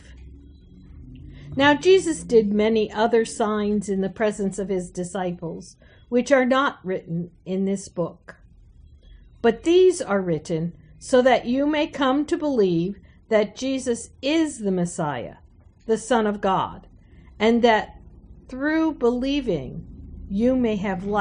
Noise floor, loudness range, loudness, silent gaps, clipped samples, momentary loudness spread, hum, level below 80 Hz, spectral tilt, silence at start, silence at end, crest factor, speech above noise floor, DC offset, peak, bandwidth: -49 dBFS; 4 LU; -22 LUFS; none; under 0.1%; 15 LU; none; -48 dBFS; -5.5 dB/octave; 0.1 s; 0 s; 18 dB; 28 dB; under 0.1%; -4 dBFS; 10 kHz